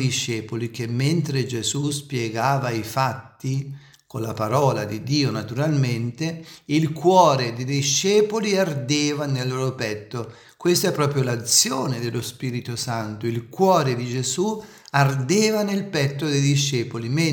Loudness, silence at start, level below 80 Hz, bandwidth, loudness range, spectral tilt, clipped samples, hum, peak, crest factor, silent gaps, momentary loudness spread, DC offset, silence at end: -22 LUFS; 0 s; -64 dBFS; 18 kHz; 4 LU; -4.5 dB/octave; under 0.1%; none; -2 dBFS; 20 dB; none; 11 LU; under 0.1%; 0 s